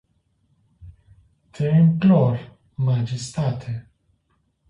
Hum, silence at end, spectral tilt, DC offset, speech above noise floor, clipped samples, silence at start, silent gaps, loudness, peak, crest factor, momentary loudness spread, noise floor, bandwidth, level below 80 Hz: none; 0.9 s; -8 dB/octave; under 0.1%; 49 dB; under 0.1%; 0.8 s; none; -21 LUFS; -6 dBFS; 16 dB; 16 LU; -68 dBFS; 10.5 kHz; -54 dBFS